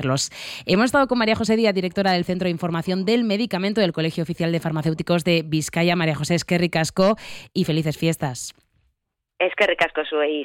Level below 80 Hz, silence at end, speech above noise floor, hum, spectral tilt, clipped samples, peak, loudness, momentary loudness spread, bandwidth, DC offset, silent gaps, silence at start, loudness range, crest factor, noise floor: -54 dBFS; 0 s; 55 dB; none; -5 dB/octave; under 0.1%; -6 dBFS; -21 LUFS; 6 LU; 16.5 kHz; under 0.1%; none; 0 s; 3 LU; 16 dB; -76 dBFS